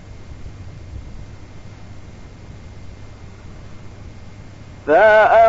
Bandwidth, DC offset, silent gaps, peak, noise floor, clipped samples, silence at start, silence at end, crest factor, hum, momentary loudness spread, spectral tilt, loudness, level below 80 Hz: 7.8 kHz; under 0.1%; none; -2 dBFS; -37 dBFS; under 0.1%; 0.2 s; 0 s; 18 dB; none; 27 LU; -6 dB/octave; -13 LUFS; -40 dBFS